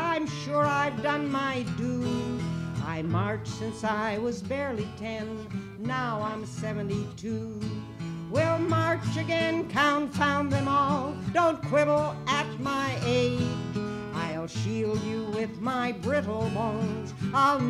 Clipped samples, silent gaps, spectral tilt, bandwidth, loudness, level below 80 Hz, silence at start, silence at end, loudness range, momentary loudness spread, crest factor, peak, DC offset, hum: under 0.1%; none; -6 dB/octave; 13 kHz; -29 LUFS; -54 dBFS; 0 s; 0 s; 6 LU; 9 LU; 18 dB; -10 dBFS; under 0.1%; none